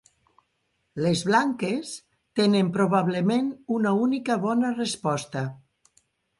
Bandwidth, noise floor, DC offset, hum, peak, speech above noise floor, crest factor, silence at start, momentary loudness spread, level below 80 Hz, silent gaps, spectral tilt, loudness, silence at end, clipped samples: 11.5 kHz; -74 dBFS; under 0.1%; none; -8 dBFS; 50 dB; 18 dB; 0.95 s; 10 LU; -66 dBFS; none; -5.5 dB/octave; -25 LUFS; 0.85 s; under 0.1%